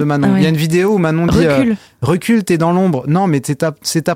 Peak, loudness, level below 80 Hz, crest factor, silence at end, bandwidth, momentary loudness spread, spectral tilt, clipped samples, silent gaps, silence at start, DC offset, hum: -2 dBFS; -14 LUFS; -40 dBFS; 10 dB; 0 s; 16.5 kHz; 5 LU; -6.5 dB/octave; under 0.1%; none; 0 s; under 0.1%; none